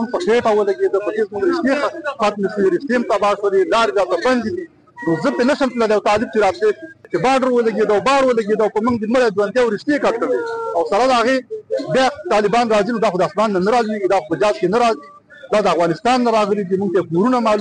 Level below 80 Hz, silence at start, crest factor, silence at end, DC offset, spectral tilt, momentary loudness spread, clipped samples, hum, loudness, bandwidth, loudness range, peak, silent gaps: -52 dBFS; 0 s; 10 dB; 0 s; under 0.1%; -5.5 dB/octave; 5 LU; under 0.1%; none; -17 LUFS; 10 kHz; 1 LU; -8 dBFS; none